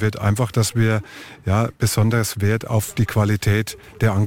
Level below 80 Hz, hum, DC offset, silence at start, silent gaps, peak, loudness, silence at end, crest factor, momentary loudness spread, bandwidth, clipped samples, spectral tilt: -44 dBFS; none; 0.4%; 0 s; none; -6 dBFS; -20 LUFS; 0 s; 12 dB; 5 LU; 16.5 kHz; under 0.1%; -5.5 dB/octave